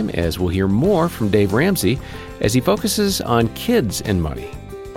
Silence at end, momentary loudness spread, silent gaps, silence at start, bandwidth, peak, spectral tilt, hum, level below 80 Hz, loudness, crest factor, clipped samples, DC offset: 0 s; 9 LU; none; 0 s; 17 kHz; -4 dBFS; -5.5 dB/octave; none; -36 dBFS; -18 LUFS; 16 dB; under 0.1%; under 0.1%